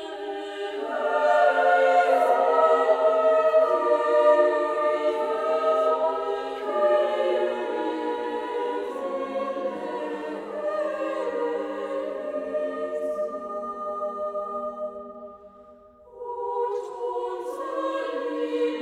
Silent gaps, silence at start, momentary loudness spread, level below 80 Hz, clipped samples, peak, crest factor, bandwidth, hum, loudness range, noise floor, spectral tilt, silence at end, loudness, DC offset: none; 0 s; 13 LU; -68 dBFS; under 0.1%; -8 dBFS; 18 dB; 11 kHz; none; 12 LU; -50 dBFS; -4 dB/octave; 0 s; -25 LUFS; under 0.1%